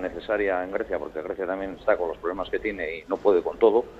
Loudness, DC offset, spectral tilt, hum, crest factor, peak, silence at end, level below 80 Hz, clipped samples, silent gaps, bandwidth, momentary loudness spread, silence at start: -26 LUFS; under 0.1%; -6.5 dB/octave; none; 20 dB; -6 dBFS; 0 s; -52 dBFS; under 0.1%; none; 7.4 kHz; 10 LU; 0 s